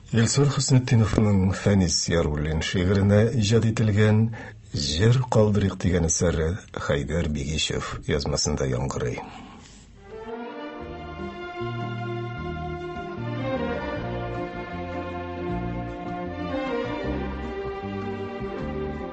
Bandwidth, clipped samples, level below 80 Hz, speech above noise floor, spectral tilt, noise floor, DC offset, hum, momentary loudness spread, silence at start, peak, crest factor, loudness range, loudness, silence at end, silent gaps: 8.6 kHz; under 0.1%; -38 dBFS; 25 dB; -5.5 dB/octave; -47 dBFS; under 0.1%; none; 14 LU; 0.05 s; -4 dBFS; 22 dB; 11 LU; -25 LUFS; 0 s; none